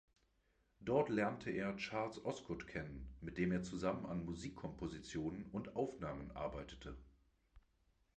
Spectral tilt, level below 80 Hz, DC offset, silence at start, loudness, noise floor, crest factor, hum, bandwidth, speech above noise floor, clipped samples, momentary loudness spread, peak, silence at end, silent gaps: -6.5 dB/octave; -60 dBFS; under 0.1%; 0.8 s; -43 LUFS; -79 dBFS; 22 dB; none; 9.2 kHz; 36 dB; under 0.1%; 12 LU; -22 dBFS; 0.6 s; none